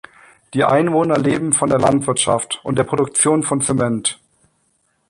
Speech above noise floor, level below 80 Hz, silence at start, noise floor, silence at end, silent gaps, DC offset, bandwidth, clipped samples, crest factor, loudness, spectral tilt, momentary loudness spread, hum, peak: 48 dB; -50 dBFS; 0.55 s; -64 dBFS; 0.95 s; none; under 0.1%; 11.5 kHz; under 0.1%; 18 dB; -17 LUFS; -4 dB/octave; 6 LU; none; 0 dBFS